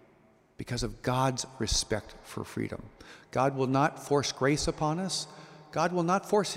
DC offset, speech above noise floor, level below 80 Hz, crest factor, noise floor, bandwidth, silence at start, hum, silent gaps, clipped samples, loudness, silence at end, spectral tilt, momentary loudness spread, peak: under 0.1%; 32 dB; -48 dBFS; 18 dB; -62 dBFS; 16 kHz; 0.6 s; none; none; under 0.1%; -30 LUFS; 0 s; -4.5 dB/octave; 14 LU; -12 dBFS